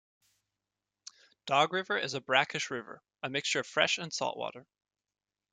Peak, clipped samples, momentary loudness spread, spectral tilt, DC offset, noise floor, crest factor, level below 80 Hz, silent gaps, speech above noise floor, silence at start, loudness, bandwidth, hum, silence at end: -10 dBFS; under 0.1%; 22 LU; -2.5 dB/octave; under 0.1%; under -90 dBFS; 26 dB; -80 dBFS; none; over 58 dB; 1.45 s; -31 LUFS; 9.6 kHz; 50 Hz at -75 dBFS; 0.9 s